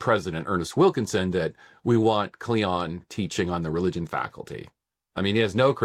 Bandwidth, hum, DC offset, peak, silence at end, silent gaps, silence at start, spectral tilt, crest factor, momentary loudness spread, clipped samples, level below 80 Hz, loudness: 14 kHz; none; under 0.1%; -8 dBFS; 0 s; none; 0 s; -6 dB/octave; 18 dB; 11 LU; under 0.1%; -54 dBFS; -25 LUFS